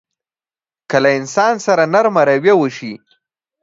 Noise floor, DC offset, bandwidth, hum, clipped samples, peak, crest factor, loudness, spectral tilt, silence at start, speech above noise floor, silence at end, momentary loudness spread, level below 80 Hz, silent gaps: under -90 dBFS; under 0.1%; 7.8 kHz; none; under 0.1%; 0 dBFS; 16 dB; -14 LUFS; -5 dB/octave; 0.9 s; over 77 dB; 0.65 s; 8 LU; -64 dBFS; none